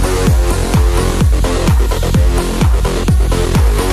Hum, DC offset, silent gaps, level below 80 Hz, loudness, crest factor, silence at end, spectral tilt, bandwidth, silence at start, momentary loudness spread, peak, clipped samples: none; under 0.1%; none; -14 dBFS; -14 LUFS; 12 dB; 0 s; -5.5 dB/octave; 15 kHz; 0 s; 1 LU; 0 dBFS; under 0.1%